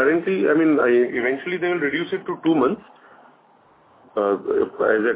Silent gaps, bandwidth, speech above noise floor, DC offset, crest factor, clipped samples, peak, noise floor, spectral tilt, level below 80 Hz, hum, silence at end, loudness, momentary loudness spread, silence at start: none; 4 kHz; 35 dB; under 0.1%; 16 dB; under 0.1%; -6 dBFS; -55 dBFS; -10 dB/octave; -64 dBFS; none; 0 s; -21 LUFS; 7 LU; 0 s